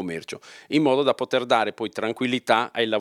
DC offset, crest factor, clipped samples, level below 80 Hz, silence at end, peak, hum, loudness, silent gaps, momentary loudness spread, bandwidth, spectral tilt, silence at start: under 0.1%; 20 dB; under 0.1%; -76 dBFS; 0 s; -4 dBFS; none; -23 LUFS; none; 12 LU; 14 kHz; -5 dB/octave; 0 s